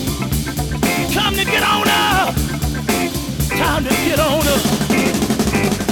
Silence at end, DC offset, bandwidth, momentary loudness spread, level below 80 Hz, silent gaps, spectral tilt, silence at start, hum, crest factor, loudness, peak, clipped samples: 0 s; under 0.1%; over 20 kHz; 7 LU; -30 dBFS; none; -4 dB/octave; 0 s; none; 16 dB; -16 LUFS; -2 dBFS; under 0.1%